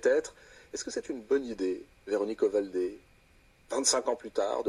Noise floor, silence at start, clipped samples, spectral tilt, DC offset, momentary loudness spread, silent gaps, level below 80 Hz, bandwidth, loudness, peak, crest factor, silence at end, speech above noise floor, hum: -62 dBFS; 0 s; under 0.1%; -2 dB/octave; under 0.1%; 11 LU; none; -64 dBFS; 12.5 kHz; -31 LUFS; -12 dBFS; 20 dB; 0 s; 31 dB; none